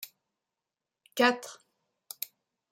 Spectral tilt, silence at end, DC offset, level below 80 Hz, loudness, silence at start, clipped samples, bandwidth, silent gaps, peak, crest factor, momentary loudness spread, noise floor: -2 dB/octave; 1.15 s; under 0.1%; -90 dBFS; -30 LUFS; 0 s; under 0.1%; 16 kHz; none; -10 dBFS; 24 dB; 21 LU; -89 dBFS